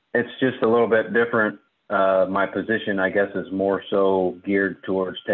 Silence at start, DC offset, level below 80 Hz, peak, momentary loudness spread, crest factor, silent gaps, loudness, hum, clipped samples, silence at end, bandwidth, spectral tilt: 0.15 s; under 0.1%; -60 dBFS; -6 dBFS; 6 LU; 14 dB; none; -22 LUFS; none; under 0.1%; 0 s; 4.2 kHz; -9.5 dB/octave